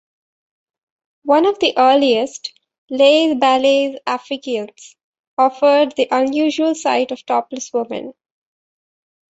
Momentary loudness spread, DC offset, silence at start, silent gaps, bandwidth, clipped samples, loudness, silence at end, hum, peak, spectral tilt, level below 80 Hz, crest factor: 15 LU; under 0.1%; 1.25 s; 2.78-2.88 s, 5.04-5.13 s, 5.20-5.37 s; 8.2 kHz; under 0.1%; -16 LUFS; 1.25 s; none; -2 dBFS; -2.5 dB/octave; -66 dBFS; 16 dB